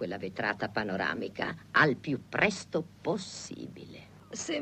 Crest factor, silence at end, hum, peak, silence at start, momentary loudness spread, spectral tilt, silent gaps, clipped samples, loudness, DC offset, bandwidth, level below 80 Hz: 22 dB; 0 s; none; -10 dBFS; 0 s; 18 LU; -4.5 dB/octave; none; under 0.1%; -31 LUFS; under 0.1%; 13.5 kHz; -64 dBFS